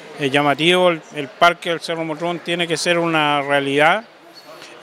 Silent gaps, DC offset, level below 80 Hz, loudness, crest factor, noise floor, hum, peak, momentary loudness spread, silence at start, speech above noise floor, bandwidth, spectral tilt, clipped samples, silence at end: none; under 0.1%; -68 dBFS; -17 LUFS; 18 dB; -41 dBFS; none; 0 dBFS; 10 LU; 0 s; 23 dB; 16 kHz; -4 dB/octave; under 0.1%; 0 s